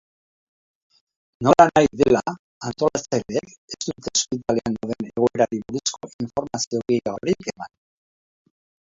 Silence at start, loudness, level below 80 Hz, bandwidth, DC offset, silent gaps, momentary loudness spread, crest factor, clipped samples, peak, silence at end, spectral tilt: 1.4 s; -22 LUFS; -54 dBFS; 7.8 kHz; under 0.1%; 2.39-2.61 s, 3.58-3.68 s, 6.13-6.19 s, 6.67-6.71 s; 16 LU; 22 dB; under 0.1%; 0 dBFS; 1.25 s; -4.5 dB/octave